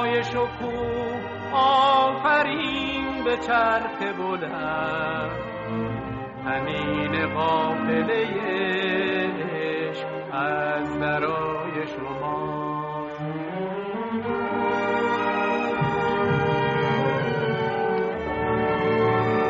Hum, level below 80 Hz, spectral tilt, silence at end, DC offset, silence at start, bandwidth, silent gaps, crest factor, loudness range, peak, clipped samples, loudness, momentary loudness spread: none; -52 dBFS; -3.5 dB/octave; 0 s; under 0.1%; 0 s; 7.6 kHz; none; 16 dB; 5 LU; -8 dBFS; under 0.1%; -24 LUFS; 9 LU